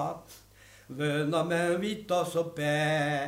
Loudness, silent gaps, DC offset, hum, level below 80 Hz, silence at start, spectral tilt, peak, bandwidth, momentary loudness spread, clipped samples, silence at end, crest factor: -29 LUFS; none; under 0.1%; none; -66 dBFS; 0 s; -5.5 dB/octave; -16 dBFS; 16 kHz; 8 LU; under 0.1%; 0 s; 14 dB